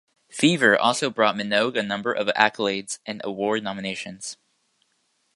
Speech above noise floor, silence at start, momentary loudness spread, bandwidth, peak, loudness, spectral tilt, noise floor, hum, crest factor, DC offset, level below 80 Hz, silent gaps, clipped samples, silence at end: 47 dB; 0.35 s; 14 LU; 11.5 kHz; 0 dBFS; -22 LUFS; -3.5 dB/octave; -70 dBFS; none; 24 dB; under 0.1%; -68 dBFS; none; under 0.1%; 1 s